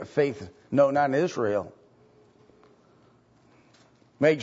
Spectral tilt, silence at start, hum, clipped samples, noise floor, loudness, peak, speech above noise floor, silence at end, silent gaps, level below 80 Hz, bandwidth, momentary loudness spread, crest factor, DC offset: -6.5 dB/octave; 0 s; none; under 0.1%; -60 dBFS; -25 LUFS; -8 dBFS; 35 dB; 0 s; none; -70 dBFS; 8 kHz; 11 LU; 20 dB; under 0.1%